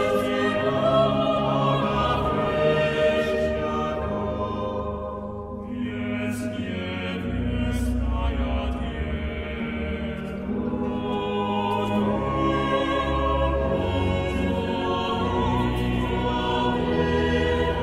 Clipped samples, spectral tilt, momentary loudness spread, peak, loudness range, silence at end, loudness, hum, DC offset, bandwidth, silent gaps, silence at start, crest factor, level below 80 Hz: under 0.1%; -7 dB/octave; 8 LU; -8 dBFS; 6 LU; 0 s; -25 LUFS; none; under 0.1%; 14.5 kHz; none; 0 s; 16 dB; -34 dBFS